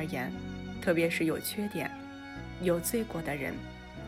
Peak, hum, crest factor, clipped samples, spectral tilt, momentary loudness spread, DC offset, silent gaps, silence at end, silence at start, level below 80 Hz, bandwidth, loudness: -16 dBFS; none; 18 dB; under 0.1%; -5 dB/octave; 14 LU; under 0.1%; none; 0 s; 0 s; -54 dBFS; 16 kHz; -33 LUFS